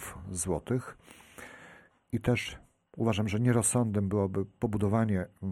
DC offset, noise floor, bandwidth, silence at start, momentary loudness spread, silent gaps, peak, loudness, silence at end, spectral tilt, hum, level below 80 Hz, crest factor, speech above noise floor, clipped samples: under 0.1%; -56 dBFS; 14 kHz; 0 s; 22 LU; none; -14 dBFS; -30 LUFS; 0 s; -5.5 dB/octave; none; -54 dBFS; 16 dB; 27 dB; under 0.1%